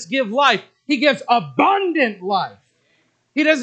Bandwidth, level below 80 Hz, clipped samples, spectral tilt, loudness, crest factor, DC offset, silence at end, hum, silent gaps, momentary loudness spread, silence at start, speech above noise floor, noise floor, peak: 8.8 kHz; -80 dBFS; under 0.1%; -4 dB/octave; -18 LUFS; 18 dB; under 0.1%; 0 s; none; none; 7 LU; 0 s; 45 dB; -63 dBFS; 0 dBFS